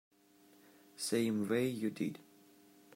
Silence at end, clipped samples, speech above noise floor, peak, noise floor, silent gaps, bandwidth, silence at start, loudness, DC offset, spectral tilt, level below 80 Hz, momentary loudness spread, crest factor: 0.75 s; under 0.1%; 30 dB; -22 dBFS; -66 dBFS; none; 16 kHz; 1 s; -36 LUFS; under 0.1%; -5 dB/octave; -82 dBFS; 14 LU; 18 dB